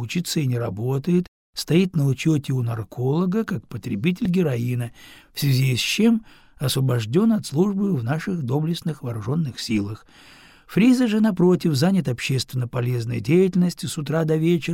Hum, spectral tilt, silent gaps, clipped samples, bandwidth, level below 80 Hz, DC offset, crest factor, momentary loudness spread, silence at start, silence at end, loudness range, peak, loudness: none; -6.5 dB/octave; 1.28-1.53 s; under 0.1%; 17 kHz; -54 dBFS; under 0.1%; 14 dB; 10 LU; 0 s; 0 s; 3 LU; -6 dBFS; -22 LUFS